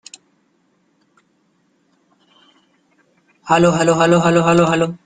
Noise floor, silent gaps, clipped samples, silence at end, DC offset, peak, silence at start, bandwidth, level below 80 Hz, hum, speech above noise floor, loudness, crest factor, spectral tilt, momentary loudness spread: -62 dBFS; none; under 0.1%; 0.1 s; under 0.1%; 0 dBFS; 3.45 s; 9.4 kHz; -54 dBFS; none; 48 dB; -14 LUFS; 18 dB; -5.5 dB/octave; 4 LU